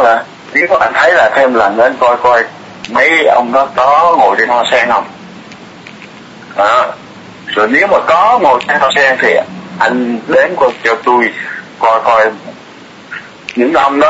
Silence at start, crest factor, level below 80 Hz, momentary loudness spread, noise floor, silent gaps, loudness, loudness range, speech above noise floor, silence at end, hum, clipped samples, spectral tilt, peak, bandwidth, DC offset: 0 s; 10 dB; -50 dBFS; 17 LU; -34 dBFS; none; -10 LUFS; 4 LU; 25 dB; 0 s; none; under 0.1%; -4 dB/octave; 0 dBFS; 8 kHz; under 0.1%